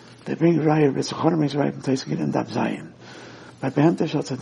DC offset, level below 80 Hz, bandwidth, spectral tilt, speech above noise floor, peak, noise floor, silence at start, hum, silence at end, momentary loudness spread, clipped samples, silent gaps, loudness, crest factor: under 0.1%; -64 dBFS; 10.5 kHz; -7 dB/octave; 21 dB; -4 dBFS; -42 dBFS; 0.1 s; none; 0 s; 21 LU; under 0.1%; none; -22 LUFS; 18 dB